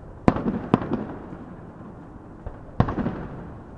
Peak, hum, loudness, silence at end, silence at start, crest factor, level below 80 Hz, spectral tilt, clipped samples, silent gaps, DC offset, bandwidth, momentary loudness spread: 0 dBFS; none; -26 LUFS; 0 s; 0 s; 28 dB; -40 dBFS; -9 dB/octave; under 0.1%; none; under 0.1%; 8.2 kHz; 18 LU